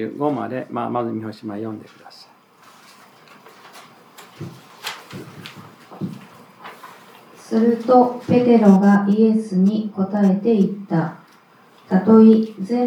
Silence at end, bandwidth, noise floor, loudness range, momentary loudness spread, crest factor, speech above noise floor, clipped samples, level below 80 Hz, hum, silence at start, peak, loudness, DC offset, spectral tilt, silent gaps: 0 s; 11 kHz; -51 dBFS; 21 LU; 24 LU; 18 dB; 34 dB; under 0.1%; -72 dBFS; none; 0 s; -2 dBFS; -17 LUFS; under 0.1%; -8.5 dB/octave; none